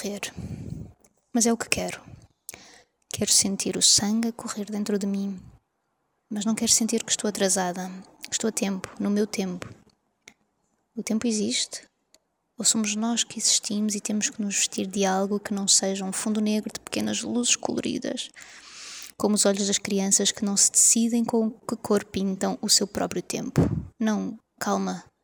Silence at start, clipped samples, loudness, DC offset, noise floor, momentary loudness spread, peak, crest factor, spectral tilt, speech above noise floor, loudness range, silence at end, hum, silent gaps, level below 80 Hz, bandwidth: 0 s; under 0.1%; -24 LUFS; under 0.1%; -75 dBFS; 17 LU; 0 dBFS; 26 dB; -3 dB/octave; 50 dB; 8 LU; 0.2 s; none; none; -56 dBFS; over 20 kHz